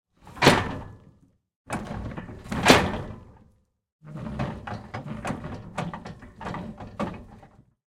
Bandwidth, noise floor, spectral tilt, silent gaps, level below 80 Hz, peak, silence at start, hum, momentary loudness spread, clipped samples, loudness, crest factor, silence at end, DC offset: 16.5 kHz; -63 dBFS; -4.5 dB/octave; 1.56-1.65 s, 3.92-3.99 s; -46 dBFS; 0 dBFS; 0.25 s; none; 22 LU; under 0.1%; -26 LUFS; 28 dB; 0.4 s; under 0.1%